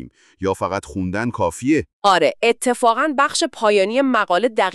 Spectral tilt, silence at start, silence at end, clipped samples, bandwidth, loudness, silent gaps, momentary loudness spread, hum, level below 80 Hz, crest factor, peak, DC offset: -4 dB/octave; 0 s; 0 s; under 0.1%; 13.5 kHz; -18 LUFS; 1.93-2.02 s; 8 LU; none; -52 dBFS; 16 dB; -2 dBFS; under 0.1%